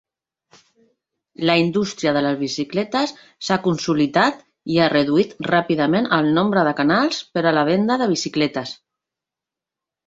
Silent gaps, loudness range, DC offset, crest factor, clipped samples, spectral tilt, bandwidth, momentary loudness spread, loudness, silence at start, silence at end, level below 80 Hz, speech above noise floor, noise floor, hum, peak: none; 4 LU; under 0.1%; 18 dB; under 0.1%; -5.5 dB/octave; 7.8 kHz; 6 LU; -19 LUFS; 1.4 s; 1.35 s; -58 dBFS; 68 dB; -87 dBFS; none; -2 dBFS